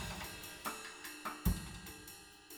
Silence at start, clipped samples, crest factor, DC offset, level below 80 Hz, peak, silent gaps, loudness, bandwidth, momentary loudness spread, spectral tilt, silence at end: 0 s; under 0.1%; 24 dB; under 0.1%; -48 dBFS; -20 dBFS; none; -43 LUFS; over 20 kHz; 12 LU; -4 dB/octave; 0 s